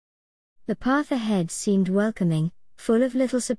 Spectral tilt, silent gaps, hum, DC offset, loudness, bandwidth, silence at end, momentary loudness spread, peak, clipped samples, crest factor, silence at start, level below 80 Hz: -6 dB/octave; none; none; 0.3%; -24 LUFS; 12 kHz; 0 s; 9 LU; -10 dBFS; under 0.1%; 14 dB; 0.7 s; -56 dBFS